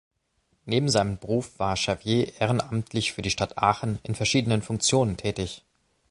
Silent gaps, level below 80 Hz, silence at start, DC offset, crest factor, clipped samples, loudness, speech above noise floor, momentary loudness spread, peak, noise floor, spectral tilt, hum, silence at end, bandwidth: none; -50 dBFS; 0.65 s; under 0.1%; 20 dB; under 0.1%; -26 LUFS; 46 dB; 7 LU; -6 dBFS; -71 dBFS; -4.5 dB/octave; none; 0.55 s; 11.5 kHz